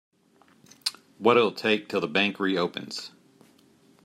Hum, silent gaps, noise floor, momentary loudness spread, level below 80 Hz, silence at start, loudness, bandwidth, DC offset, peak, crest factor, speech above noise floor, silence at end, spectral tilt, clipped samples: none; none; -61 dBFS; 14 LU; -76 dBFS; 0.85 s; -26 LUFS; 15.5 kHz; under 0.1%; -6 dBFS; 22 dB; 36 dB; 0.95 s; -4.5 dB/octave; under 0.1%